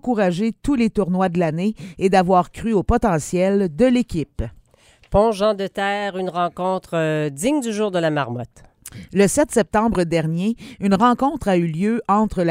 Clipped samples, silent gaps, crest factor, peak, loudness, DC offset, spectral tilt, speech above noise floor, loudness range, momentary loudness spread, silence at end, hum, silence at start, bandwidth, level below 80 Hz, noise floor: under 0.1%; none; 18 dB; -2 dBFS; -20 LUFS; under 0.1%; -6 dB/octave; 35 dB; 3 LU; 8 LU; 0 s; none; 0.05 s; 16 kHz; -38 dBFS; -54 dBFS